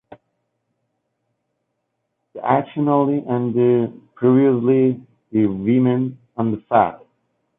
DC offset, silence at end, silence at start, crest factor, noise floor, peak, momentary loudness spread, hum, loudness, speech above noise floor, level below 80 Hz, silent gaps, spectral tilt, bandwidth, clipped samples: under 0.1%; 0.6 s; 2.35 s; 16 dB; -75 dBFS; -4 dBFS; 9 LU; none; -19 LUFS; 57 dB; -60 dBFS; none; -12 dB/octave; 3.8 kHz; under 0.1%